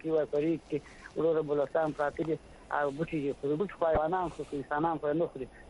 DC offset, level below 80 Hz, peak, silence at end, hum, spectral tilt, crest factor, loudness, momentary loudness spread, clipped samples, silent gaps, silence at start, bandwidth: under 0.1%; -54 dBFS; -14 dBFS; 0 s; none; -7.5 dB/octave; 18 dB; -32 LUFS; 7 LU; under 0.1%; none; 0.05 s; 11 kHz